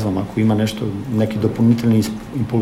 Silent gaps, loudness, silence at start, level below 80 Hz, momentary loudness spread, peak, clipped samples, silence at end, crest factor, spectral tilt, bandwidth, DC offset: none; -18 LUFS; 0 s; -44 dBFS; 8 LU; -2 dBFS; under 0.1%; 0 s; 14 dB; -7.5 dB/octave; 15.5 kHz; under 0.1%